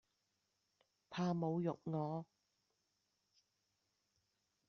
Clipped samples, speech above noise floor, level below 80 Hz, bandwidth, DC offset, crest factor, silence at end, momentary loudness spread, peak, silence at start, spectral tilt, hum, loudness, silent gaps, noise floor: under 0.1%; 45 dB; -84 dBFS; 6.8 kHz; under 0.1%; 20 dB; 2.45 s; 11 LU; -28 dBFS; 1.1 s; -7.5 dB/octave; none; -42 LUFS; none; -85 dBFS